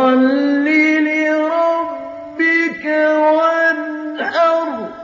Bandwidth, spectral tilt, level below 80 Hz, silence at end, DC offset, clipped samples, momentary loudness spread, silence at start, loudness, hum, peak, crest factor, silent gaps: 7.4 kHz; -1.5 dB/octave; -66 dBFS; 0 s; under 0.1%; under 0.1%; 10 LU; 0 s; -15 LUFS; none; -2 dBFS; 12 dB; none